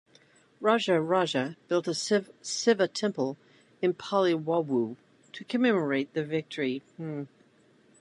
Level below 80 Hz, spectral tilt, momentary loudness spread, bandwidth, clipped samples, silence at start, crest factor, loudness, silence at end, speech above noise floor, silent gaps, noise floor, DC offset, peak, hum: -78 dBFS; -4.5 dB/octave; 12 LU; 11 kHz; under 0.1%; 0.6 s; 20 dB; -28 LUFS; 0.75 s; 34 dB; none; -62 dBFS; under 0.1%; -8 dBFS; none